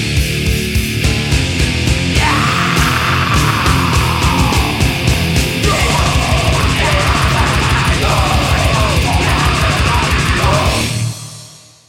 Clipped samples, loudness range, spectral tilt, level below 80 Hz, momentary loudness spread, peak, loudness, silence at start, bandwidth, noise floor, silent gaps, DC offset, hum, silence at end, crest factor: under 0.1%; 1 LU; -4.5 dB/octave; -20 dBFS; 3 LU; 0 dBFS; -13 LUFS; 0 s; 16.5 kHz; -37 dBFS; none; under 0.1%; none; 0.35 s; 12 dB